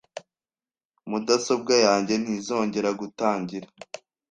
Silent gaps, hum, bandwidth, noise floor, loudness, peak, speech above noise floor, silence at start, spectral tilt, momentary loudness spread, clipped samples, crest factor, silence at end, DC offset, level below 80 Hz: 0.85-0.90 s; none; 10 kHz; under -90 dBFS; -24 LUFS; -6 dBFS; over 66 dB; 0.15 s; -3.5 dB/octave; 22 LU; under 0.1%; 20 dB; 0.35 s; under 0.1%; -68 dBFS